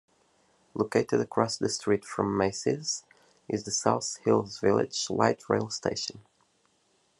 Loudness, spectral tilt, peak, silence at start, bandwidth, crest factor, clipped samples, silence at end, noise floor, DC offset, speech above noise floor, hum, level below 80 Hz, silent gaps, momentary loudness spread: -28 LUFS; -4 dB/octave; -6 dBFS; 0.75 s; 11.5 kHz; 24 dB; under 0.1%; 1 s; -69 dBFS; under 0.1%; 41 dB; none; -72 dBFS; none; 8 LU